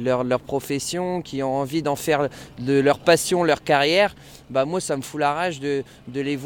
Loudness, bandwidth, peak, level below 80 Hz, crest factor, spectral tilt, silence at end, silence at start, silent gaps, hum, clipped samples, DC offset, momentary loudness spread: -22 LUFS; 18 kHz; -4 dBFS; -54 dBFS; 18 dB; -4.5 dB/octave; 0 s; 0 s; none; none; under 0.1%; under 0.1%; 9 LU